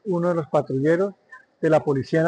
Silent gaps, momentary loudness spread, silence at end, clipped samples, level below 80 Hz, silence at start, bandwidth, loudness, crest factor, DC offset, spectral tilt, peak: none; 4 LU; 0 s; under 0.1%; -64 dBFS; 0.05 s; 9.4 kHz; -22 LUFS; 14 dB; under 0.1%; -8 dB/octave; -8 dBFS